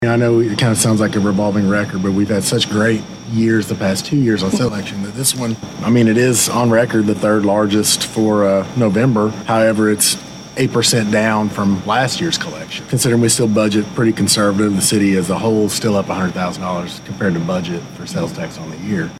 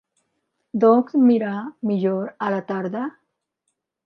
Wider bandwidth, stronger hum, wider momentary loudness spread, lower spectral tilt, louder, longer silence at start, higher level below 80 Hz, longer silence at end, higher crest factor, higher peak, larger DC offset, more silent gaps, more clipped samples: first, 16 kHz vs 5.2 kHz; neither; second, 9 LU vs 12 LU; second, -4.5 dB/octave vs -9.5 dB/octave; first, -15 LUFS vs -21 LUFS; second, 0 s vs 0.75 s; first, -50 dBFS vs -76 dBFS; second, 0 s vs 0.95 s; about the same, 16 dB vs 18 dB; first, 0 dBFS vs -4 dBFS; neither; neither; neither